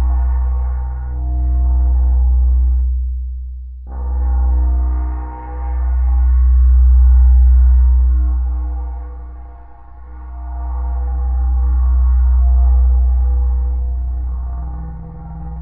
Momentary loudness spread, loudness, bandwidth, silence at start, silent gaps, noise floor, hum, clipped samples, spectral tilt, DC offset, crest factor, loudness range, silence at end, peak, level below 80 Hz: 18 LU; -16 LUFS; 1.9 kHz; 0 s; none; -35 dBFS; none; under 0.1%; -14.5 dB/octave; under 0.1%; 10 dB; 7 LU; 0 s; -4 dBFS; -14 dBFS